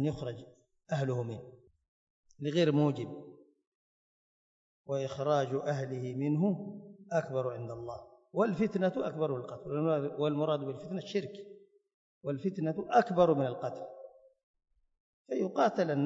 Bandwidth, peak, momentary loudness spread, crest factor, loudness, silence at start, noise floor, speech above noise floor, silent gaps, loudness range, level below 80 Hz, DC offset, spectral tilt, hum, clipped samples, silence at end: 7.8 kHz; -14 dBFS; 17 LU; 20 dB; -33 LUFS; 0 s; under -90 dBFS; over 58 dB; 1.88-2.23 s, 3.67-4.84 s, 11.94-12.21 s, 14.43-14.54 s, 15.00-15.25 s; 3 LU; -70 dBFS; under 0.1%; -7.5 dB/octave; none; under 0.1%; 0 s